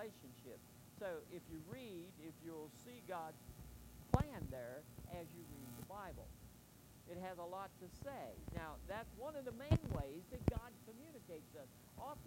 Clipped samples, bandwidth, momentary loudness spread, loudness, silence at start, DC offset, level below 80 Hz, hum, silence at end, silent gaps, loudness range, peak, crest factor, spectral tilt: under 0.1%; 16 kHz; 18 LU; -49 LUFS; 0 s; under 0.1%; -58 dBFS; none; 0 s; none; 8 LU; -16 dBFS; 32 dB; -6.5 dB/octave